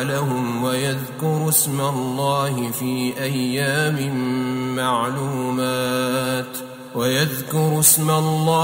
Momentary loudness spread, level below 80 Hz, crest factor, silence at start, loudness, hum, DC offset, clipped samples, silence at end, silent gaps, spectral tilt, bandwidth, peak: 8 LU; -58 dBFS; 20 dB; 0 s; -20 LUFS; none; under 0.1%; under 0.1%; 0 s; none; -4 dB/octave; 16.5 kHz; -2 dBFS